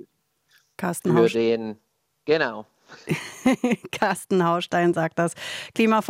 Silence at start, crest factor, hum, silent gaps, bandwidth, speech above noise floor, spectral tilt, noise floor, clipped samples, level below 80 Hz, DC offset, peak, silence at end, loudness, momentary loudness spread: 0.8 s; 18 dB; none; none; 16 kHz; 44 dB; -5.5 dB/octave; -66 dBFS; under 0.1%; -66 dBFS; under 0.1%; -6 dBFS; 0 s; -23 LUFS; 11 LU